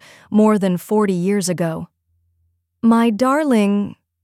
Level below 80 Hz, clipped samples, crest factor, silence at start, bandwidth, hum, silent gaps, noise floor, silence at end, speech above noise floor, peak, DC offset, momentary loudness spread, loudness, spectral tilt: -62 dBFS; under 0.1%; 16 dB; 0.3 s; 15 kHz; none; none; -66 dBFS; 0.3 s; 50 dB; -2 dBFS; under 0.1%; 9 LU; -17 LUFS; -6.5 dB/octave